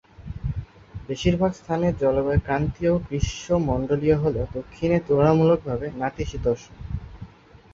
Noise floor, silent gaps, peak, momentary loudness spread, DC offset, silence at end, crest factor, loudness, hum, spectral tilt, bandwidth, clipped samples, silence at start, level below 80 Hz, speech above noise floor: -47 dBFS; none; -6 dBFS; 16 LU; under 0.1%; 0.45 s; 16 dB; -23 LUFS; none; -7.5 dB/octave; 7.6 kHz; under 0.1%; 0.2 s; -36 dBFS; 24 dB